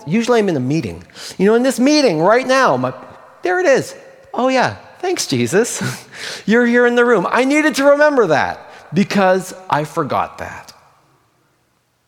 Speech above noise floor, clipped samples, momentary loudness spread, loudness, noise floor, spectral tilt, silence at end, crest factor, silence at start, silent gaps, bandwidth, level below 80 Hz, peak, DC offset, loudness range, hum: 47 dB; under 0.1%; 15 LU; -15 LUFS; -62 dBFS; -4.5 dB/octave; 1.45 s; 16 dB; 0 s; none; 17.5 kHz; -58 dBFS; 0 dBFS; under 0.1%; 4 LU; none